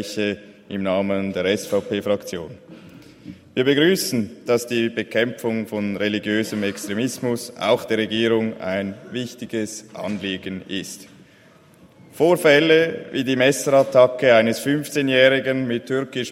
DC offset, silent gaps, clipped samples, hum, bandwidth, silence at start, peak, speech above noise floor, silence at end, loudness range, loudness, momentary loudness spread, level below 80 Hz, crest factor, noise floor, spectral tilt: under 0.1%; none; under 0.1%; none; 16 kHz; 0 s; -2 dBFS; 31 dB; 0 s; 8 LU; -20 LUFS; 14 LU; -64 dBFS; 20 dB; -51 dBFS; -4.5 dB/octave